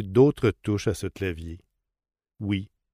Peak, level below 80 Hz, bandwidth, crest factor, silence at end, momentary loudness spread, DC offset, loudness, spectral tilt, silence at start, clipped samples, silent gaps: -8 dBFS; -48 dBFS; 15.5 kHz; 18 dB; 0.25 s; 17 LU; under 0.1%; -26 LUFS; -7 dB/octave; 0 s; under 0.1%; none